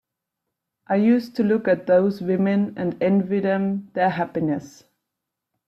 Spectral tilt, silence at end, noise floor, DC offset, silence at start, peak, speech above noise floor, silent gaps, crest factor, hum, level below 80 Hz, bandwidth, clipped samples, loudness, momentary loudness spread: -8.5 dB/octave; 1 s; -83 dBFS; under 0.1%; 0.9 s; -8 dBFS; 62 dB; none; 16 dB; none; -64 dBFS; 7.6 kHz; under 0.1%; -22 LUFS; 7 LU